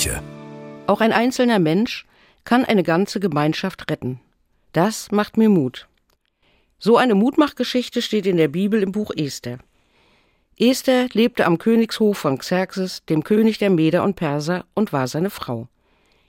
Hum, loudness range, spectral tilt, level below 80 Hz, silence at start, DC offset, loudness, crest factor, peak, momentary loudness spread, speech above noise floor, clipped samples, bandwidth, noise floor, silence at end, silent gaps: none; 3 LU; -5.5 dB/octave; -50 dBFS; 0 s; under 0.1%; -19 LUFS; 18 dB; -2 dBFS; 12 LU; 46 dB; under 0.1%; 16.5 kHz; -65 dBFS; 0.65 s; none